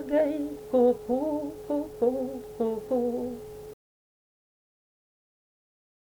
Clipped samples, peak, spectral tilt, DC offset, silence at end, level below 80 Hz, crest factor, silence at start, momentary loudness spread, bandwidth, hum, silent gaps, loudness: under 0.1%; -12 dBFS; -7 dB/octave; under 0.1%; 2.4 s; -60 dBFS; 18 dB; 0 s; 14 LU; over 20 kHz; none; none; -28 LUFS